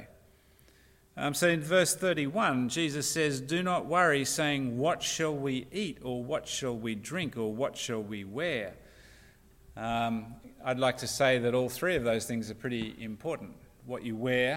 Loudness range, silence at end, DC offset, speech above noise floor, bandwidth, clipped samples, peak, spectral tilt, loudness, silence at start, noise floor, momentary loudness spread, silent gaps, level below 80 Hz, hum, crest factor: 7 LU; 0 s; under 0.1%; 31 dB; 16.5 kHz; under 0.1%; -12 dBFS; -4 dB/octave; -31 LUFS; 0 s; -61 dBFS; 12 LU; none; -60 dBFS; none; 20 dB